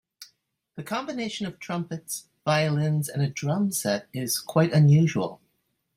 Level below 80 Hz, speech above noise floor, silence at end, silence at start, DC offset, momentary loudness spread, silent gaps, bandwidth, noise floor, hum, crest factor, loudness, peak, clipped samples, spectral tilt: -66 dBFS; 50 dB; 0.6 s; 0.2 s; under 0.1%; 14 LU; none; 16 kHz; -74 dBFS; none; 18 dB; -25 LUFS; -8 dBFS; under 0.1%; -5.5 dB/octave